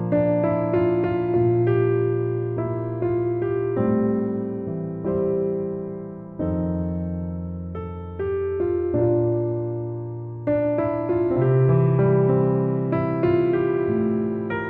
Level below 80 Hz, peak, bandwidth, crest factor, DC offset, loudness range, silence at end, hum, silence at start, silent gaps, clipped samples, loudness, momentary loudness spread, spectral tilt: -48 dBFS; -8 dBFS; 4.2 kHz; 14 dB; under 0.1%; 6 LU; 0 s; none; 0 s; none; under 0.1%; -23 LUFS; 11 LU; -12.5 dB/octave